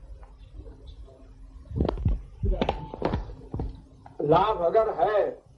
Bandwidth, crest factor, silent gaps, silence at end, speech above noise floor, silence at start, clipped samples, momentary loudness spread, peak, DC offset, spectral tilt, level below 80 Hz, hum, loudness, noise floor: 6.8 kHz; 20 dB; none; 0.2 s; 24 dB; 0 s; under 0.1%; 25 LU; -8 dBFS; under 0.1%; -8.5 dB/octave; -36 dBFS; none; -27 LUFS; -47 dBFS